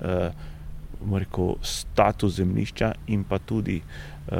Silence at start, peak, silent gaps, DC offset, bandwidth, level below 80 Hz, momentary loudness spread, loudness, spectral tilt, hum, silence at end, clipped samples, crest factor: 0 s; -4 dBFS; none; under 0.1%; 16.5 kHz; -38 dBFS; 18 LU; -26 LUFS; -6 dB/octave; none; 0 s; under 0.1%; 22 dB